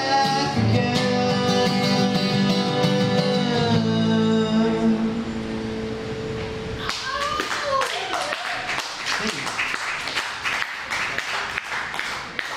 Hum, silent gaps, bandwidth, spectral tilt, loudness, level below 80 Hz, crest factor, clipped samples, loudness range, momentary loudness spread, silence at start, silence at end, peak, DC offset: none; none; 15 kHz; -5 dB/octave; -23 LUFS; -48 dBFS; 18 dB; under 0.1%; 5 LU; 8 LU; 0 s; 0 s; -6 dBFS; under 0.1%